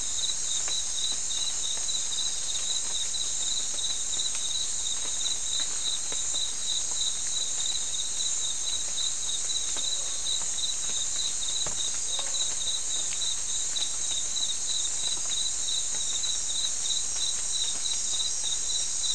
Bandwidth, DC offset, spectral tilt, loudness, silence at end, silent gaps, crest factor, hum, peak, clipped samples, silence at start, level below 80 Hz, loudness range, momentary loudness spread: 12 kHz; 2%; 2 dB/octave; -27 LUFS; 0 s; none; 16 dB; none; -14 dBFS; under 0.1%; 0 s; -54 dBFS; 1 LU; 1 LU